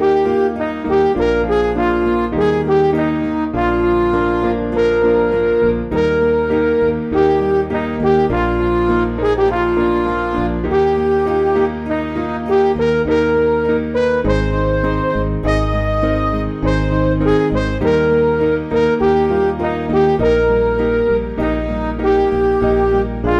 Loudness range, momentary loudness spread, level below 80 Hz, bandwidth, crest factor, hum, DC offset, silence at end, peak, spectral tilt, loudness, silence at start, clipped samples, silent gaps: 1 LU; 4 LU; -28 dBFS; 8.4 kHz; 12 dB; none; under 0.1%; 0 s; -2 dBFS; -8 dB/octave; -16 LUFS; 0 s; under 0.1%; none